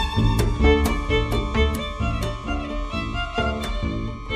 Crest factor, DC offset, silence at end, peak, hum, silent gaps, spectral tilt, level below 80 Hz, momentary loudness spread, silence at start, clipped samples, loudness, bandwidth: 18 dB; under 0.1%; 0 s; -4 dBFS; none; none; -6 dB/octave; -26 dBFS; 9 LU; 0 s; under 0.1%; -24 LUFS; 15 kHz